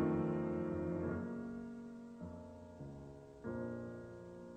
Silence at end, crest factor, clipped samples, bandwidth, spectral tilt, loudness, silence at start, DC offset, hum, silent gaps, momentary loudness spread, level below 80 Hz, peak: 0 s; 18 dB; under 0.1%; 9 kHz; -9.5 dB/octave; -44 LUFS; 0 s; under 0.1%; none; none; 14 LU; -66 dBFS; -26 dBFS